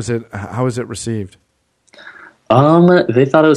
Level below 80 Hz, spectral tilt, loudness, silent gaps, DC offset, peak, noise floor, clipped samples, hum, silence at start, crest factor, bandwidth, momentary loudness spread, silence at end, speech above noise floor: -52 dBFS; -7 dB/octave; -14 LUFS; none; under 0.1%; 0 dBFS; -59 dBFS; under 0.1%; none; 0 s; 14 dB; 11.5 kHz; 16 LU; 0 s; 46 dB